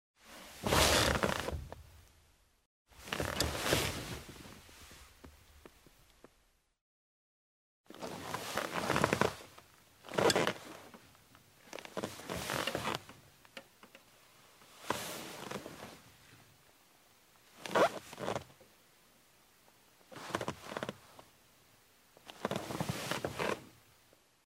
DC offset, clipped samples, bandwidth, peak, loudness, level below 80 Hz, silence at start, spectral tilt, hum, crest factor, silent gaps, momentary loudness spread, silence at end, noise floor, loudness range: under 0.1%; under 0.1%; 16 kHz; -8 dBFS; -35 LUFS; -56 dBFS; 0.25 s; -3.5 dB/octave; none; 32 dB; 2.66-2.85 s, 6.81-7.84 s; 25 LU; 0.75 s; -72 dBFS; 11 LU